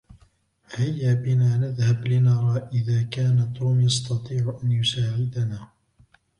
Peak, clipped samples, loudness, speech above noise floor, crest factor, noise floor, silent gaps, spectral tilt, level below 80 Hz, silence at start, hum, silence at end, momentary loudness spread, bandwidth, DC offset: -10 dBFS; under 0.1%; -23 LUFS; 39 dB; 14 dB; -60 dBFS; none; -6 dB/octave; -56 dBFS; 0.1 s; none; 0.75 s; 7 LU; 10.5 kHz; under 0.1%